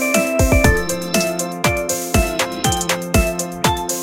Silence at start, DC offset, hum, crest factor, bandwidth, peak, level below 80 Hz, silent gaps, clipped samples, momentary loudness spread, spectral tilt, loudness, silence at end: 0 s; under 0.1%; none; 18 dB; 17 kHz; 0 dBFS; -26 dBFS; none; under 0.1%; 5 LU; -4 dB/octave; -18 LUFS; 0 s